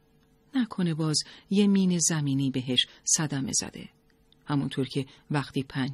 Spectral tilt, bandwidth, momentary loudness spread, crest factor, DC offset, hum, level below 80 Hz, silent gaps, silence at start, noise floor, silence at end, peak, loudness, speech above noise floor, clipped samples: -4 dB/octave; 13 kHz; 9 LU; 18 dB; under 0.1%; none; -64 dBFS; none; 0.55 s; -63 dBFS; 0 s; -10 dBFS; -27 LUFS; 35 dB; under 0.1%